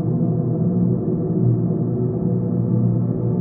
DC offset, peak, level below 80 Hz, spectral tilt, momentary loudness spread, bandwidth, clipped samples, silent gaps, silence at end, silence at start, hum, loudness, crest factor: under 0.1%; -6 dBFS; -46 dBFS; -17 dB/octave; 2 LU; 1.8 kHz; under 0.1%; none; 0 s; 0 s; none; -20 LUFS; 12 dB